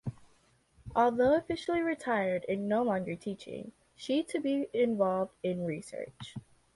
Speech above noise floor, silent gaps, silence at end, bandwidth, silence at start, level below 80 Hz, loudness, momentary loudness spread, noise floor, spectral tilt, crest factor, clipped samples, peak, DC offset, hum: 36 dB; none; 0.35 s; 11.5 kHz; 0.05 s; -62 dBFS; -31 LUFS; 16 LU; -67 dBFS; -6.5 dB/octave; 18 dB; under 0.1%; -14 dBFS; under 0.1%; none